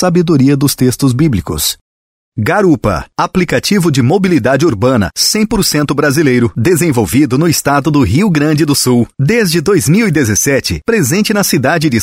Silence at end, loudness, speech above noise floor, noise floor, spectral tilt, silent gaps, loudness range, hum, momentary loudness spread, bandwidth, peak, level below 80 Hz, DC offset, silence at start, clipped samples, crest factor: 0 s; -11 LUFS; over 80 dB; under -90 dBFS; -5 dB/octave; 1.81-2.32 s; 2 LU; none; 4 LU; 16.5 kHz; 0 dBFS; -34 dBFS; under 0.1%; 0 s; under 0.1%; 10 dB